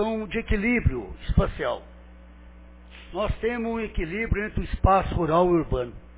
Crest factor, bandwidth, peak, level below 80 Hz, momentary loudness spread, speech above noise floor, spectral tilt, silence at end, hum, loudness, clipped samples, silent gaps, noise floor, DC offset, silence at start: 20 dB; 4 kHz; -4 dBFS; -32 dBFS; 9 LU; 22 dB; -11 dB/octave; 0 s; none; -26 LUFS; under 0.1%; none; -47 dBFS; under 0.1%; 0 s